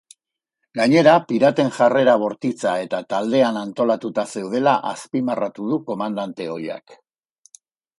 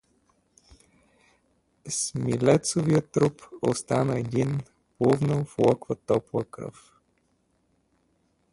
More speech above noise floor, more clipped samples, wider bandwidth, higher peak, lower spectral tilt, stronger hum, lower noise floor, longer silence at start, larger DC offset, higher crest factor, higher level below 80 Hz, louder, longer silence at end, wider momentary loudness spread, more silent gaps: first, 60 dB vs 45 dB; neither; about the same, 11.5 kHz vs 11.5 kHz; first, 0 dBFS vs -6 dBFS; about the same, -6 dB/octave vs -6 dB/octave; neither; first, -79 dBFS vs -70 dBFS; second, 0.75 s vs 1.85 s; neither; about the same, 20 dB vs 20 dB; second, -68 dBFS vs -60 dBFS; first, -20 LUFS vs -26 LUFS; second, 1.05 s vs 1.85 s; first, 13 LU vs 10 LU; neither